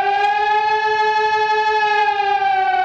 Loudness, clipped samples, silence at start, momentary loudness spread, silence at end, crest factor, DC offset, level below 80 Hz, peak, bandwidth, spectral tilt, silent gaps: -16 LUFS; under 0.1%; 0 s; 1 LU; 0 s; 10 dB; under 0.1%; -58 dBFS; -6 dBFS; 7.8 kHz; -2 dB/octave; none